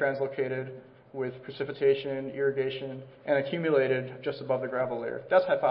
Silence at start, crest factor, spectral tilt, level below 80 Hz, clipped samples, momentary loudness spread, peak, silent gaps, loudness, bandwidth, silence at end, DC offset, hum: 0 s; 18 dB; -10 dB/octave; -72 dBFS; under 0.1%; 12 LU; -10 dBFS; none; -29 LUFS; 5.4 kHz; 0 s; under 0.1%; none